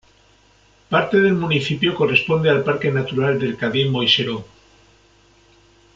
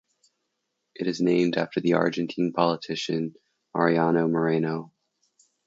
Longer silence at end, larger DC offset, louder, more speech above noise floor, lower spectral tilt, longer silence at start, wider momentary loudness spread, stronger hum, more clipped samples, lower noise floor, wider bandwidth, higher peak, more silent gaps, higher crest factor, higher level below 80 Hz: first, 1.5 s vs 0.8 s; neither; first, -18 LUFS vs -25 LUFS; second, 36 dB vs 55 dB; about the same, -6.5 dB/octave vs -6.5 dB/octave; about the same, 0.9 s vs 1 s; second, 5 LU vs 9 LU; neither; neither; second, -54 dBFS vs -79 dBFS; about the same, 7.6 kHz vs 7.8 kHz; first, -2 dBFS vs -6 dBFS; neither; about the same, 18 dB vs 20 dB; first, -54 dBFS vs -70 dBFS